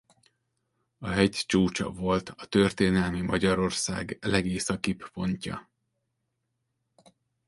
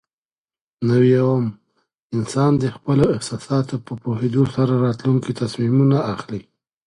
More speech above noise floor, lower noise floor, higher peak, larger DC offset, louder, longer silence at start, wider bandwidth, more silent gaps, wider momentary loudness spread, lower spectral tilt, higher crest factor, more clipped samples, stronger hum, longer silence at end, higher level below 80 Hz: second, 53 dB vs over 72 dB; second, -80 dBFS vs under -90 dBFS; second, -8 dBFS vs -4 dBFS; neither; second, -27 LUFS vs -19 LUFS; first, 1 s vs 0.8 s; about the same, 11.5 kHz vs 11 kHz; second, none vs 2.02-2.10 s; second, 8 LU vs 11 LU; second, -5 dB/octave vs -7.5 dB/octave; first, 22 dB vs 16 dB; neither; neither; first, 1.85 s vs 0.45 s; about the same, -50 dBFS vs -52 dBFS